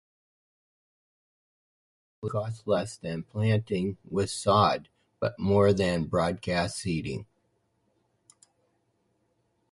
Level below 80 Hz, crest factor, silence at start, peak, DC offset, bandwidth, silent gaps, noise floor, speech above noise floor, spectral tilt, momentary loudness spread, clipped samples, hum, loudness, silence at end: -52 dBFS; 22 dB; 2.2 s; -8 dBFS; under 0.1%; 11.5 kHz; none; -73 dBFS; 46 dB; -6 dB/octave; 12 LU; under 0.1%; none; -28 LUFS; 2.5 s